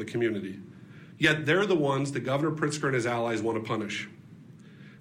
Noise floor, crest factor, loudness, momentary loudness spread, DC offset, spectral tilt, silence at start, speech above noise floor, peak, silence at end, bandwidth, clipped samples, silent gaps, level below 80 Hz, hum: -50 dBFS; 20 dB; -28 LUFS; 16 LU; under 0.1%; -5.5 dB/octave; 0 s; 22 dB; -10 dBFS; 0.05 s; 15.5 kHz; under 0.1%; none; -66 dBFS; none